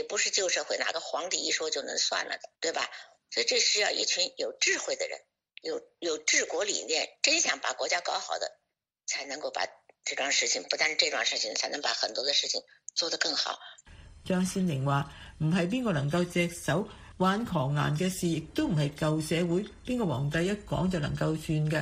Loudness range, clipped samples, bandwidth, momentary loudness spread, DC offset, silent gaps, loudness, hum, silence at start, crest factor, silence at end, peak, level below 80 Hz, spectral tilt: 3 LU; under 0.1%; 14.5 kHz; 10 LU; under 0.1%; none; -29 LUFS; none; 0 s; 22 dB; 0 s; -8 dBFS; -56 dBFS; -3 dB/octave